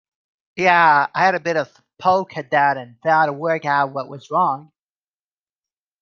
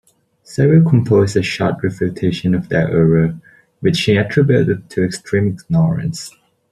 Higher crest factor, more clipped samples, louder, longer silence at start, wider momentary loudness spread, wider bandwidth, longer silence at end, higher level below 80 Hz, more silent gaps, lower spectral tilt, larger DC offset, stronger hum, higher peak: about the same, 18 dB vs 14 dB; neither; about the same, -18 LUFS vs -16 LUFS; about the same, 0.55 s vs 0.5 s; about the same, 10 LU vs 8 LU; second, 7.2 kHz vs 12 kHz; first, 1.4 s vs 0.4 s; second, -70 dBFS vs -46 dBFS; neither; second, -5.5 dB/octave vs -7 dB/octave; neither; neither; about the same, -2 dBFS vs -2 dBFS